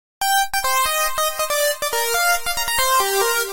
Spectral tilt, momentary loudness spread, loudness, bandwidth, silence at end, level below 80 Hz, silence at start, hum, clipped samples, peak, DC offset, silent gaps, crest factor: 0.5 dB/octave; 3 LU; -18 LUFS; 17 kHz; 0 s; -44 dBFS; 0.2 s; none; under 0.1%; -4 dBFS; under 0.1%; none; 16 dB